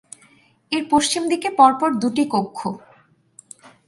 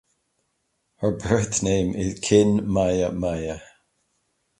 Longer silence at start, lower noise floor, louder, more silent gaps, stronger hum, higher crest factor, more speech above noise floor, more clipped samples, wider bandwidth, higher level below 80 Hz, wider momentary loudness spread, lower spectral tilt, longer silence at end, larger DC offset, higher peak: second, 0.7 s vs 1 s; second, -55 dBFS vs -73 dBFS; first, -19 LUFS vs -23 LUFS; neither; neither; about the same, 20 dB vs 20 dB; second, 36 dB vs 52 dB; neither; about the same, 11.5 kHz vs 11.5 kHz; second, -62 dBFS vs -44 dBFS; first, 14 LU vs 10 LU; second, -3.5 dB/octave vs -5.5 dB/octave; first, 1.1 s vs 0.95 s; neither; about the same, -2 dBFS vs -4 dBFS